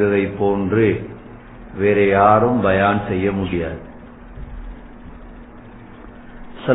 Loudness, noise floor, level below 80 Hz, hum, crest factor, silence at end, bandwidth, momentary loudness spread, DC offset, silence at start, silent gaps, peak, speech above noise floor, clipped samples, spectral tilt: -17 LUFS; -39 dBFS; -40 dBFS; none; 20 dB; 0 s; 4 kHz; 26 LU; under 0.1%; 0 s; none; 0 dBFS; 22 dB; under 0.1%; -11.5 dB/octave